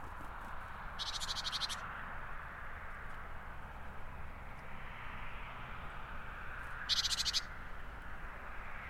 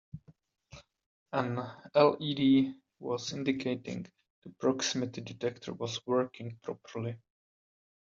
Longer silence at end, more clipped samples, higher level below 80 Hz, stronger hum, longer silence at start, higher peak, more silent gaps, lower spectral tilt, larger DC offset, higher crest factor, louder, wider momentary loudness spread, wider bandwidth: second, 0 s vs 0.85 s; neither; first, -50 dBFS vs -72 dBFS; neither; second, 0 s vs 0.15 s; second, -20 dBFS vs -10 dBFS; second, none vs 1.06-1.26 s, 4.30-4.42 s; second, -1.5 dB/octave vs -5 dB/octave; neither; about the same, 22 dB vs 24 dB; second, -42 LUFS vs -32 LUFS; about the same, 16 LU vs 17 LU; first, 15.5 kHz vs 7.6 kHz